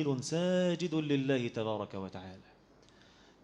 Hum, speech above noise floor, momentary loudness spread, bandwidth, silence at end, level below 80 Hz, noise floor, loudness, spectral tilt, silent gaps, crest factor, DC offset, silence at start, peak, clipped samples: none; 28 dB; 14 LU; 11 kHz; 1.05 s; -72 dBFS; -62 dBFS; -33 LUFS; -6 dB/octave; none; 16 dB; under 0.1%; 0 s; -18 dBFS; under 0.1%